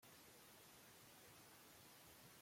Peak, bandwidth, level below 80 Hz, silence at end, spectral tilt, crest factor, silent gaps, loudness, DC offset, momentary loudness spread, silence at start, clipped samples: -52 dBFS; 16.5 kHz; -88 dBFS; 0 s; -2.5 dB/octave; 12 dB; none; -64 LUFS; under 0.1%; 0 LU; 0 s; under 0.1%